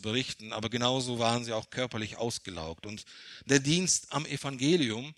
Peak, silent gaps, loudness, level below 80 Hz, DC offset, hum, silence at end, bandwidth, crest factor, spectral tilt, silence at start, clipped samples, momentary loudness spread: -8 dBFS; none; -30 LUFS; -64 dBFS; under 0.1%; none; 0.05 s; 13 kHz; 24 dB; -3.5 dB/octave; 0 s; under 0.1%; 15 LU